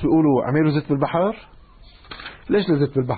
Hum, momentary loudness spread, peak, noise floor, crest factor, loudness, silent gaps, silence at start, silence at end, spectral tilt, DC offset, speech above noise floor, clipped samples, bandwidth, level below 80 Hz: none; 19 LU; -6 dBFS; -46 dBFS; 14 dB; -20 LUFS; none; 0 s; 0 s; -12.5 dB/octave; under 0.1%; 27 dB; under 0.1%; 4.8 kHz; -46 dBFS